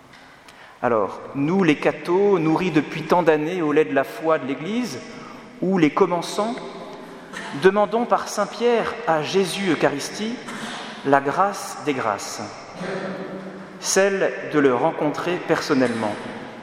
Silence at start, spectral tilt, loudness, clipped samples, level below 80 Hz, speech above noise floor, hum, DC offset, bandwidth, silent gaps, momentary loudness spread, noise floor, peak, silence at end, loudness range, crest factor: 0.15 s; -5 dB/octave; -22 LUFS; under 0.1%; -64 dBFS; 25 dB; none; under 0.1%; 16 kHz; none; 14 LU; -46 dBFS; 0 dBFS; 0 s; 4 LU; 22 dB